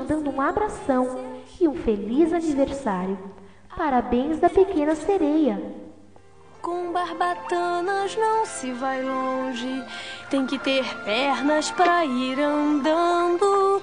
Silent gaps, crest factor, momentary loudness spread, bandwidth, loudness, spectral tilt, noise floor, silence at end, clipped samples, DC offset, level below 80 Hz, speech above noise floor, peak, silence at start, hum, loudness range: none; 16 dB; 11 LU; 10 kHz; -23 LUFS; -4.5 dB/octave; -51 dBFS; 0 s; under 0.1%; 0.3%; -50 dBFS; 28 dB; -6 dBFS; 0 s; none; 4 LU